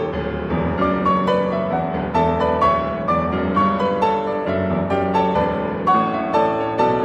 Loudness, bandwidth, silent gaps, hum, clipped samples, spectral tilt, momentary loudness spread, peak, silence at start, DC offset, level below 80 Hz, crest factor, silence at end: -19 LUFS; 8.2 kHz; none; none; under 0.1%; -8 dB/octave; 4 LU; -4 dBFS; 0 s; under 0.1%; -40 dBFS; 14 dB; 0 s